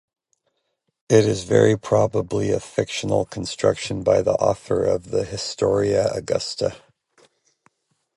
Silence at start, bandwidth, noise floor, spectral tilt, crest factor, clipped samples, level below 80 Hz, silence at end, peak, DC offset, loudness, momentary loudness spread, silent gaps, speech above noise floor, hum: 1.1 s; 11.5 kHz; -74 dBFS; -5.5 dB/octave; 20 dB; under 0.1%; -50 dBFS; 1.4 s; -2 dBFS; under 0.1%; -21 LUFS; 8 LU; none; 54 dB; none